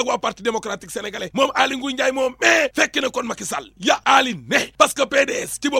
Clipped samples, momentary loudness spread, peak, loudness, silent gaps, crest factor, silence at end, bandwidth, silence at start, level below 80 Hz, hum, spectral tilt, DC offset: under 0.1%; 11 LU; 0 dBFS; -19 LUFS; none; 20 dB; 0 s; 16.5 kHz; 0 s; -56 dBFS; none; -2 dB/octave; under 0.1%